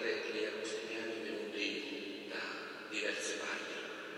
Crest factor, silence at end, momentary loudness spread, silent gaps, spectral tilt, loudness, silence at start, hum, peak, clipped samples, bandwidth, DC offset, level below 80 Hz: 16 dB; 0 s; 6 LU; none; -2 dB/octave; -40 LUFS; 0 s; none; -24 dBFS; under 0.1%; 16 kHz; under 0.1%; under -90 dBFS